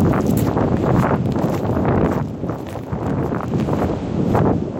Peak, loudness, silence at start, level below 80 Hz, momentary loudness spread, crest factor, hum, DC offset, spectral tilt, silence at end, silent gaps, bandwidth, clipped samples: -2 dBFS; -19 LUFS; 0 s; -34 dBFS; 8 LU; 16 dB; none; under 0.1%; -8.5 dB/octave; 0 s; none; 17 kHz; under 0.1%